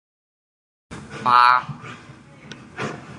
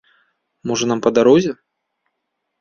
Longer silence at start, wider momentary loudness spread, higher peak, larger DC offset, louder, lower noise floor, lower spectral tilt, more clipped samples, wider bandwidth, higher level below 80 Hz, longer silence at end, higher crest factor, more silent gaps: first, 0.9 s vs 0.65 s; first, 25 LU vs 17 LU; about the same, -2 dBFS vs -2 dBFS; neither; about the same, -17 LUFS vs -16 LUFS; second, -44 dBFS vs -75 dBFS; about the same, -4 dB/octave vs -5 dB/octave; neither; first, 11 kHz vs 7.2 kHz; about the same, -58 dBFS vs -58 dBFS; second, 0 s vs 1.05 s; about the same, 22 dB vs 18 dB; neither